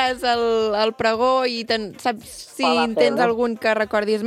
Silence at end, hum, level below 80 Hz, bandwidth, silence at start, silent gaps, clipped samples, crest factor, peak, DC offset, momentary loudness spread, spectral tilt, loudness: 0 s; none; -54 dBFS; 14.5 kHz; 0 s; none; under 0.1%; 16 dB; -4 dBFS; under 0.1%; 8 LU; -4 dB/octave; -20 LUFS